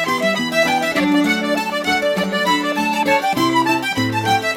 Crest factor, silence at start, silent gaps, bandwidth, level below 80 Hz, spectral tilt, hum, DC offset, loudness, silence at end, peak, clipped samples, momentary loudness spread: 14 dB; 0 s; none; 17 kHz; -54 dBFS; -4 dB/octave; none; under 0.1%; -17 LUFS; 0 s; -4 dBFS; under 0.1%; 3 LU